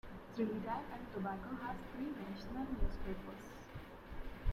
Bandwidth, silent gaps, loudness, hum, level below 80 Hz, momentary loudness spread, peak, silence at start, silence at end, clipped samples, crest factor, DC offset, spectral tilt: 14.5 kHz; none; -45 LUFS; none; -48 dBFS; 12 LU; -24 dBFS; 0.05 s; 0 s; under 0.1%; 18 dB; under 0.1%; -7.5 dB/octave